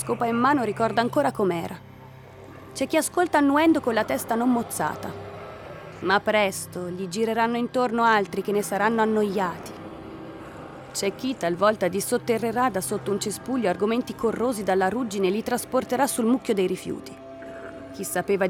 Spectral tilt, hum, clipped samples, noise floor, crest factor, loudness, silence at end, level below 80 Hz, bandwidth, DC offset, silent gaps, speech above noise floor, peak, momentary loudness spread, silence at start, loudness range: -4.5 dB/octave; none; under 0.1%; -45 dBFS; 16 dB; -24 LUFS; 0 s; -60 dBFS; 19.5 kHz; under 0.1%; none; 21 dB; -8 dBFS; 18 LU; 0 s; 3 LU